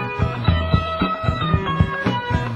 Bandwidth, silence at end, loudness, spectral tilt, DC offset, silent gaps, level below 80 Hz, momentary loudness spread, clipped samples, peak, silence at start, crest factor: 8.2 kHz; 0 s; -21 LUFS; -7.5 dB/octave; under 0.1%; none; -28 dBFS; 3 LU; under 0.1%; -2 dBFS; 0 s; 18 dB